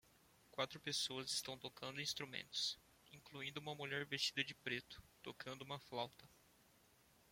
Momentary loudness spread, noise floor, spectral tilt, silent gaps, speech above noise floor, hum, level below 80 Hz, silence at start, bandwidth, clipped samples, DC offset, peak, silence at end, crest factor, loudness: 15 LU; -72 dBFS; -2 dB/octave; none; 25 dB; none; -78 dBFS; 0.5 s; 16.5 kHz; under 0.1%; under 0.1%; -24 dBFS; 0.95 s; 24 dB; -45 LUFS